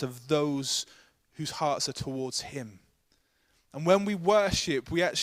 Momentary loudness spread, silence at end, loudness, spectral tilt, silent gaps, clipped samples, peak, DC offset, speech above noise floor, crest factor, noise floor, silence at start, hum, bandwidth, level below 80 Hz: 15 LU; 0 s; -28 LUFS; -4 dB/octave; none; under 0.1%; -8 dBFS; under 0.1%; 42 dB; 22 dB; -70 dBFS; 0 s; none; 15.5 kHz; -56 dBFS